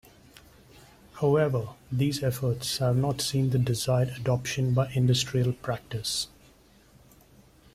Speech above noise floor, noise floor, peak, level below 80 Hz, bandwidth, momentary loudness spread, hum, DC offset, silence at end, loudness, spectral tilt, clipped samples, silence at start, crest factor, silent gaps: 31 dB; -57 dBFS; -12 dBFS; -54 dBFS; 15.5 kHz; 7 LU; none; under 0.1%; 1.5 s; -27 LUFS; -5.5 dB/octave; under 0.1%; 1.15 s; 16 dB; none